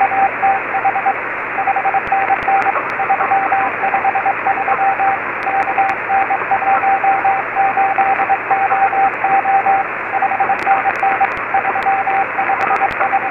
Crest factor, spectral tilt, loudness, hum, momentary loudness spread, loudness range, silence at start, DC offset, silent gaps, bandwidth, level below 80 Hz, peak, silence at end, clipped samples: 14 dB; -5.5 dB/octave; -15 LUFS; none; 3 LU; 1 LU; 0 s; under 0.1%; none; 5.8 kHz; -52 dBFS; 0 dBFS; 0 s; under 0.1%